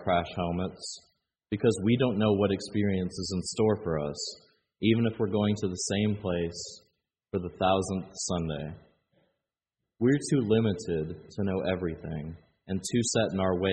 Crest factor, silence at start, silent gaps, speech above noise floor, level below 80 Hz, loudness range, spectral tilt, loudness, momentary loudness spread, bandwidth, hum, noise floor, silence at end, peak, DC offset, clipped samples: 20 dB; 0 s; none; 59 dB; -56 dBFS; 4 LU; -5.5 dB/octave; -29 LUFS; 12 LU; 9 kHz; none; -88 dBFS; 0 s; -10 dBFS; under 0.1%; under 0.1%